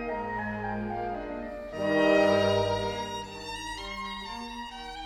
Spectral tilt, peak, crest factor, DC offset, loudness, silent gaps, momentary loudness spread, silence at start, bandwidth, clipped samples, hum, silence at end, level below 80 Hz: -5 dB/octave; -12 dBFS; 18 dB; under 0.1%; -30 LUFS; none; 15 LU; 0 s; 13 kHz; under 0.1%; none; 0 s; -50 dBFS